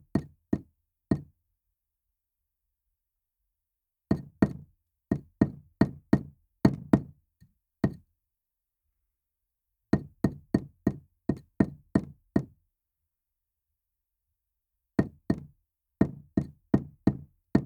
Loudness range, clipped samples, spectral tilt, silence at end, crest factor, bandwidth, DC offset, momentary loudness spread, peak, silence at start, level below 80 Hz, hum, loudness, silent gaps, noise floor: 8 LU; under 0.1%; -9 dB/octave; 0 s; 28 dB; 12.5 kHz; under 0.1%; 7 LU; -6 dBFS; 0.15 s; -52 dBFS; none; -31 LUFS; none; -86 dBFS